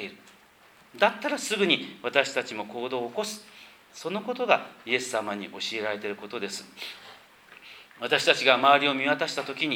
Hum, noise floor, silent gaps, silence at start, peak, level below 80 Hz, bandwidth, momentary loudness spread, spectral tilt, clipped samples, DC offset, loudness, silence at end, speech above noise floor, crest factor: none; -56 dBFS; none; 0 s; -2 dBFS; -78 dBFS; 20 kHz; 19 LU; -2.5 dB/octave; under 0.1%; under 0.1%; -26 LUFS; 0 s; 29 dB; 26 dB